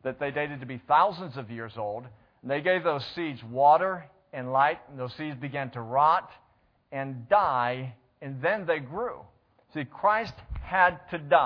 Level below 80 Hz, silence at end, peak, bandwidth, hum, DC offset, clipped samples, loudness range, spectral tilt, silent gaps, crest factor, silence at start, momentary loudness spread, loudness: -54 dBFS; 0 s; -6 dBFS; 5.4 kHz; none; under 0.1%; under 0.1%; 3 LU; -7.5 dB/octave; none; 22 dB; 0.05 s; 16 LU; -27 LUFS